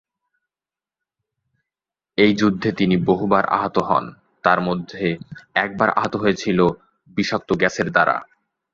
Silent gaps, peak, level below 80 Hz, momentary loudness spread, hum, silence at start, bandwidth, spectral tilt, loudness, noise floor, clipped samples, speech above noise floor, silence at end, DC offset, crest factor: none; 0 dBFS; -52 dBFS; 7 LU; none; 2.2 s; 7.6 kHz; -6 dB/octave; -20 LUFS; under -90 dBFS; under 0.1%; over 71 dB; 0.5 s; under 0.1%; 20 dB